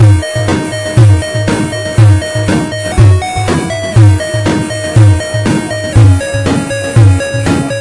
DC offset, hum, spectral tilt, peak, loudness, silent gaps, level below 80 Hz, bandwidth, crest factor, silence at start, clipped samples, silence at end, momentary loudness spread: under 0.1%; none; -6 dB/octave; 0 dBFS; -10 LUFS; none; -28 dBFS; 11.5 kHz; 8 dB; 0 s; 0.5%; 0 s; 6 LU